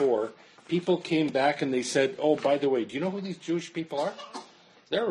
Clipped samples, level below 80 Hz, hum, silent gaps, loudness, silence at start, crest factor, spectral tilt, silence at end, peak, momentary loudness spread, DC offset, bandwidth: under 0.1%; -74 dBFS; none; none; -28 LUFS; 0 s; 18 dB; -5 dB/octave; 0 s; -10 dBFS; 10 LU; under 0.1%; 11 kHz